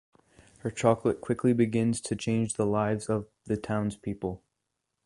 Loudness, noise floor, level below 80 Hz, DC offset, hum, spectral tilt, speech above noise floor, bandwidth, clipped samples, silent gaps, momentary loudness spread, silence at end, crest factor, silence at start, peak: -29 LUFS; -82 dBFS; -58 dBFS; under 0.1%; none; -6.5 dB/octave; 55 dB; 11.5 kHz; under 0.1%; none; 11 LU; 0.7 s; 22 dB; 0.65 s; -8 dBFS